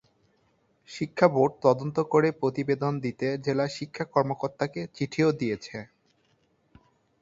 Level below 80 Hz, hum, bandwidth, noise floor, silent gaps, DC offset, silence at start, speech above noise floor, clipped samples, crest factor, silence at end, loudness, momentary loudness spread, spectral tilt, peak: -66 dBFS; none; 7.8 kHz; -68 dBFS; none; under 0.1%; 0.9 s; 42 dB; under 0.1%; 24 dB; 1.35 s; -27 LUFS; 11 LU; -7 dB/octave; -4 dBFS